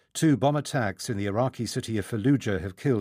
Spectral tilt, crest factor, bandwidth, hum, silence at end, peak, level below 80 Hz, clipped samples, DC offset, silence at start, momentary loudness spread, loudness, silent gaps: -6 dB/octave; 16 dB; 15.5 kHz; none; 0 s; -10 dBFS; -60 dBFS; under 0.1%; under 0.1%; 0.15 s; 7 LU; -27 LUFS; none